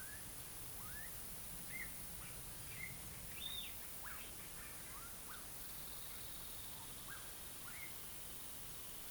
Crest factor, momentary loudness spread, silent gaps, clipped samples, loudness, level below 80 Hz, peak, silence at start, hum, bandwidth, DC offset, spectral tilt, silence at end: 16 dB; 3 LU; none; under 0.1%; -47 LUFS; -64 dBFS; -32 dBFS; 0 s; none; over 20 kHz; under 0.1%; -1.5 dB/octave; 0 s